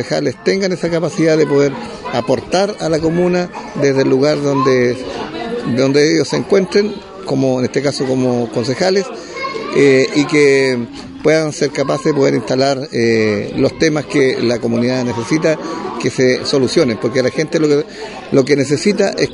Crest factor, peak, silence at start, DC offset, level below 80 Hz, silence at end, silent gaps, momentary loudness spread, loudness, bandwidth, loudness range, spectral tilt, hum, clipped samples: 14 dB; 0 dBFS; 0 s; under 0.1%; -48 dBFS; 0 s; none; 9 LU; -15 LUFS; 11 kHz; 2 LU; -5.5 dB/octave; none; under 0.1%